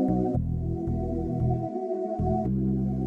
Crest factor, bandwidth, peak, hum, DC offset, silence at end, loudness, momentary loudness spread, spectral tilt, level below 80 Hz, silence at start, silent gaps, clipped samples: 12 dB; 2.4 kHz; -16 dBFS; none; under 0.1%; 0 s; -28 LUFS; 4 LU; -12 dB/octave; -38 dBFS; 0 s; none; under 0.1%